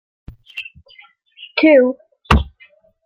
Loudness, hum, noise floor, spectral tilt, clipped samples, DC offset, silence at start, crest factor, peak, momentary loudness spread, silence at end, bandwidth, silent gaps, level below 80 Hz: -15 LUFS; none; -51 dBFS; -7 dB/octave; under 0.1%; under 0.1%; 0.55 s; 18 dB; 0 dBFS; 22 LU; 0.65 s; 12.5 kHz; none; -30 dBFS